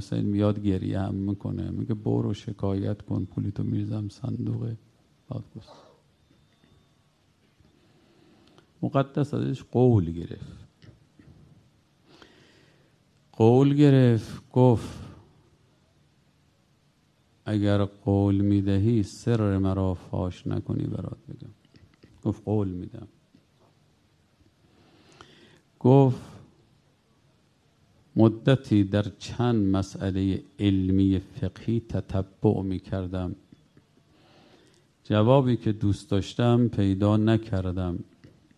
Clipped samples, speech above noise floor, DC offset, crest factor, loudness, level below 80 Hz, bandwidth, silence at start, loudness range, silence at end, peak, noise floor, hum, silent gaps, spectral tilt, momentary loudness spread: under 0.1%; 40 dB; under 0.1%; 22 dB; -25 LUFS; -46 dBFS; 10 kHz; 0 s; 12 LU; 0.55 s; -4 dBFS; -65 dBFS; none; none; -8.5 dB/octave; 16 LU